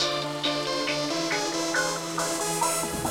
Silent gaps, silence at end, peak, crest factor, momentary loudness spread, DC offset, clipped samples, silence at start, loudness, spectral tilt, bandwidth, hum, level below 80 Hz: none; 0 s; -12 dBFS; 16 dB; 2 LU; 0.1%; under 0.1%; 0 s; -26 LUFS; -2 dB/octave; 16.5 kHz; none; -56 dBFS